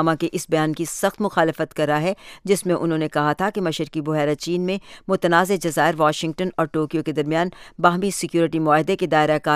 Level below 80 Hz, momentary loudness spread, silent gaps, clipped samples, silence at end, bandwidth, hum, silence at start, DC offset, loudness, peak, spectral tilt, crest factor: -56 dBFS; 6 LU; none; under 0.1%; 0 s; 15.5 kHz; none; 0 s; under 0.1%; -21 LUFS; -2 dBFS; -5 dB/octave; 20 dB